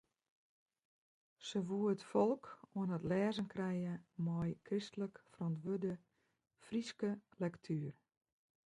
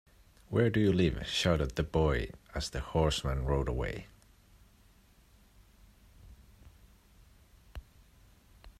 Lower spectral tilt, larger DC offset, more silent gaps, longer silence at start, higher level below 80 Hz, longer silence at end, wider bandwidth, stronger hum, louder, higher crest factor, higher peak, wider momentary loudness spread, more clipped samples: about the same, -7 dB/octave vs -6 dB/octave; neither; neither; first, 1.4 s vs 0.5 s; second, -74 dBFS vs -44 dBFS; first, 0.75 s vs 0.1 s; second, 11 kHz vs 14.5 kHz; neither; second, -41 LUFS vs -31 LUFS; about the same, 20 dB vs 20 dB; second, -22 dBFS vs -14 dBFS; second, 9 LU vs 17 LU; neither